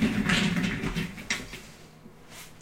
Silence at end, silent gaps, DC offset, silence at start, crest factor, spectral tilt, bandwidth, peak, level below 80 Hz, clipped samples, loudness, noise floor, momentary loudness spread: 0 s; none; under 0.1%; 0 s; 22 dB; -4.5 dB/octave; 16 kHz; -8 dBFS; -46 dBFS; under 0.1%; -28 LUFS; -49 dBFS; 23 LU